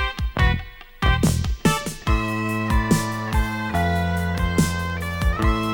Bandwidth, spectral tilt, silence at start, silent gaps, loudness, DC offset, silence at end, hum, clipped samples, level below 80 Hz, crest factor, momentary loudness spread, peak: 19.5 kHz; -5.5 dB/octave; 0 s; none; -22 LUFS; under 0.1%; 0 s; none; under 0.1%; -26 dBFS; 16 dB; 5 LU; -4 dBFS